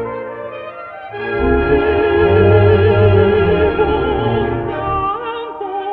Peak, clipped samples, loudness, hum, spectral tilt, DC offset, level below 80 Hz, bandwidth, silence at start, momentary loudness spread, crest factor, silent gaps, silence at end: 0 dBFS; under 0.1%; -14 LUFS; none; -10.5 dB/octave; under 0.1%; -30 dBFS; 4.4 kHz; 0 s; 17 LU; 14 dB; none; 0 s